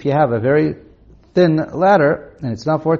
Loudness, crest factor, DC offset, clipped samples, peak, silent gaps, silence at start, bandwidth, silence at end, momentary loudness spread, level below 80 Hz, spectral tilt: -16 LUFS; 14 dB; under 0.1%; under 0.1%; -2 dBFS; none; 0 s; 7.2 kHz; 0 s; 10 LU; -50 dBFS; -6.5 dB/octave